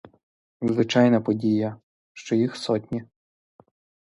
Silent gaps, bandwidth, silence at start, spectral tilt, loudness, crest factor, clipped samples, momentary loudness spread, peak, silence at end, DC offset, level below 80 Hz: 1.83-2.15 s; 11 kHz; 0.6 s; -6.5 dB/octave; -24 LUFS; 20 dB; under 0.1%; 14 LU; -4 dBFS; 1 s; under 0.1%; -64 dBFS